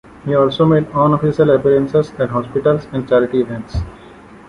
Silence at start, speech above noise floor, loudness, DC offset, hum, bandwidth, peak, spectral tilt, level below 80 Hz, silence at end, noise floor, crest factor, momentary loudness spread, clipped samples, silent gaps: 0.25 s; 25 dB; -15 LUFS; under 0.1%; none; 10.5 kHz; -2 dBFS; -8.5 dB/octave; -36 dBFS; 0.15 s; -39 dBFS; 14 dB; 10 LU; under 0.1%; none